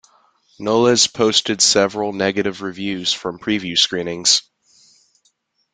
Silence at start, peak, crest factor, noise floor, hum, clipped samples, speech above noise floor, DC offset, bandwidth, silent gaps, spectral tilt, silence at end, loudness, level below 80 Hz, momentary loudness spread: 0.6 s; 0 dBFS; 20 dB; -64 dBFS; none; under 0.1%; 46 dB; under 0.1%; 10 kHz; none; -2 dB/octave; 1.35 s; -17 LUFS; -60 dBFS; 9 LU